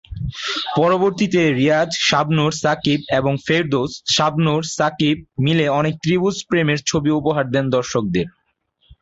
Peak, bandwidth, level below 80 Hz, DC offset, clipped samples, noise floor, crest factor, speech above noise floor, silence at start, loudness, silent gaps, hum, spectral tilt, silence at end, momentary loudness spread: -2 dBFS; 8 kHz; -46 dBFS; under 0.1%; under 0.1%; -65 dBFS; 16 dB; 47 dB; 0.1 s; -18 LUFS; none; none; -5 dB/octave; 0.75 s; 5 LU